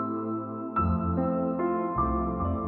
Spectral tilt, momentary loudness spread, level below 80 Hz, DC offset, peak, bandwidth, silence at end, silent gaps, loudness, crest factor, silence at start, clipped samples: -11 dB/octave; 5 LU; -40 dBFS; under 0.1%; -14 dBFS; 3.8 kHz; 0 s; none; -29 LUFS; 14 dB; 0 s; under 0.1%